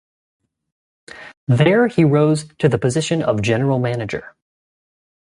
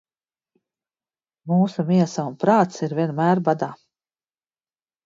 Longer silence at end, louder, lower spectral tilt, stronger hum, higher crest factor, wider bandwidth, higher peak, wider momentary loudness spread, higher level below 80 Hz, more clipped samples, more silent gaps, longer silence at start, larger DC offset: second, 1 s vs 1.3 s; first, -17 LUFS vs -21 LUFS; about the same, -6.5 dB/octave vs -7.5 dB/octave; neither; about the same, 16 dB vs 20 dB; first, 11.5 kHz vs 7.6 kHz; about the same, -2 dBFS vs -4 dBFS; first, 15 LU vs 7 LU; first, -52 dBFS vs -68 dBFS; neither; first, 1.37-1.47 s vs none; second, 1.15 s vs 1.45 s; neither